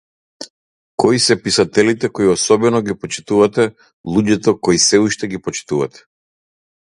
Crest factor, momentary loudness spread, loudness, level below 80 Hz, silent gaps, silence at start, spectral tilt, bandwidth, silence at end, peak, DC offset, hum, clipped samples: 16 dB; 14 LU; -15 LUFS; -50 dBFS; 0.50-0.98 s, 3.93-4.04 s; 0.4 s; -4 dB/octave; 11.5 kHz; 0.95 s; 0 dBFS; under 0.1%; none; under 0.1%